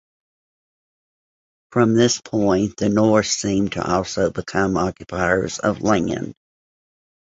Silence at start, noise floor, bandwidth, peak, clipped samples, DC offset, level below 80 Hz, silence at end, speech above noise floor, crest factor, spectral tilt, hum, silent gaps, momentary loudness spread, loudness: 1.7 s; under -90 dBFS; 8 kHz; -2 dBFS; under 0.1%; under 0.1%; -46 dBFS; 1.05 s; over 71 dB; 20 dB; -5 dB/octave; none; none; 7 LU; -20 LUFS